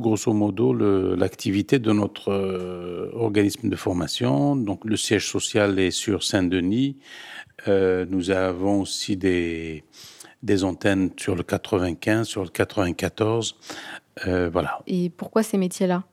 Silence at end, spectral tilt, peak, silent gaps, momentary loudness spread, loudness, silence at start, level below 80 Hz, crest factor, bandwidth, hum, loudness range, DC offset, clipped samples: 0.1 s; -5 dB/octave; -4 dBFS; none; 11 LU; -23 LUFS; 0 s; -54 dBFS; 18 dB; 15.5 kHz; none; 3 LU; under 0.1%; under 0.1%